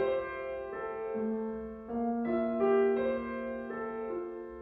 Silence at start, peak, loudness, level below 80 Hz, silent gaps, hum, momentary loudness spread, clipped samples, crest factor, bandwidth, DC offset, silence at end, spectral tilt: 0 s; -18 dBFS; -34 LUFS; -60 dBFS; none; none; 11 LU; under 0.1%; 16 dB; 4.6 kHz; under 0.1%; 0 s; -9 dB/octave